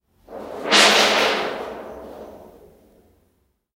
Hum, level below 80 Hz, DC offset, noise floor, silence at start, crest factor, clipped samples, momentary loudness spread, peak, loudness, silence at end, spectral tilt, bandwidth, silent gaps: none; -58 dBFS; under 0.1%; -67 dBFS; 0.3 s; 22 dB; under 0.1%; 25 LU; 0 dBFS; -15 LUFS; 1.3 s; -1 dB/octave; 16 kHz; none